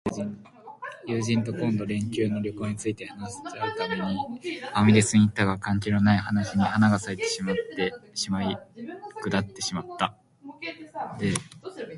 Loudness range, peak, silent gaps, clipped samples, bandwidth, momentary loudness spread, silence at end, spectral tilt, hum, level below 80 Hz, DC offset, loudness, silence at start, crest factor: 8 LU; -6 dBFS; none; under 0.1%; 11.5 kHz; 16 LU; 0 s; -5.5 dB/octave; none; -52 dBFS; under 0.1%; -26 LUFS; 0.05 s; 20 dB